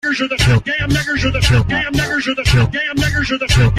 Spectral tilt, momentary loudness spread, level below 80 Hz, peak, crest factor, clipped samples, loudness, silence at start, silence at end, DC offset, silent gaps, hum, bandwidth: -5 dB/octave; 3 LU; -24 dBFS; -2 dBFS; 12 dB; under 0.1%; -15 LUFS; 0.05 s; 0 s; under 0.1%; none; none; 15 kHz